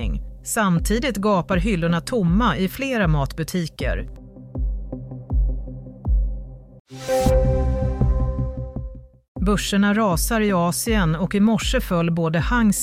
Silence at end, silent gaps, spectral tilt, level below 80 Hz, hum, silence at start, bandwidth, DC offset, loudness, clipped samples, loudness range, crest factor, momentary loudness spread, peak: 0 s; 6.80-6.85 s, 9.28-9.35 s; -5.5 dB/octave; -26 dBFS; none; 0 s; 16 kHz; under 0.1%; -21 LUFS; under 0.1%; 7 LU; 14 dB; 15 LU; -6 dBFS